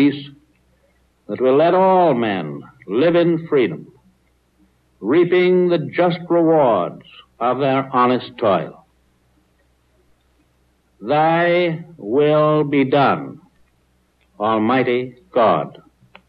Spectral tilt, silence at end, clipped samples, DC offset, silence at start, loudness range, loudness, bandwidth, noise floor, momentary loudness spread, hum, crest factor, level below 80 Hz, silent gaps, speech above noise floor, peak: -9.5 dB/octave; 0.6 s; under 0.1%; under 0.1%; 0 s; 5 LU; -17 LUFS; 5 kHz; -61 dBFS; 14 LU; none; 14 dB; -62 dBFS; none; 44 dB; -6 dBFS